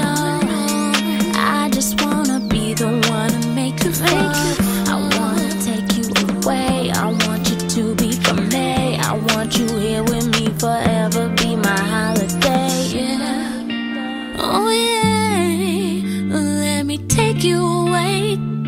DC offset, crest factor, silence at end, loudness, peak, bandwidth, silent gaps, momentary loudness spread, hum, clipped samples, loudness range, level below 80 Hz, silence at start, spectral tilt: under 0.1%; 16 dB; 0 s; -18 LUFS; 0 dBFS; 16.5 kHz; none; 4 LU; none; under 0.1%; 1 LU; -40 dBFS; 0 s; -4.5 dB/octave